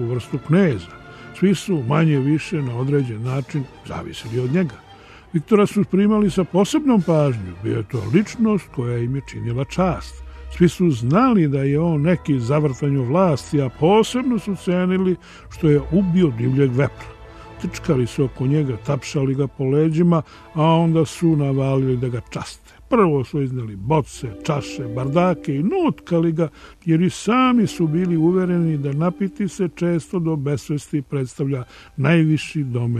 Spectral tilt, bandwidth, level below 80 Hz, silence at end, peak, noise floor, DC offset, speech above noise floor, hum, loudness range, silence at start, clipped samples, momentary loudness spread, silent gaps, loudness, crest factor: -7.5 dB/octave; 13.5 kHz; -44 dBFS; 0 s; -2 dBFS; -39 dBFS; under 0.1%; 20 dB; none; 4 LU; 0 s; under 0.1%; 11 LU; none; -20 LUFS; 18 dB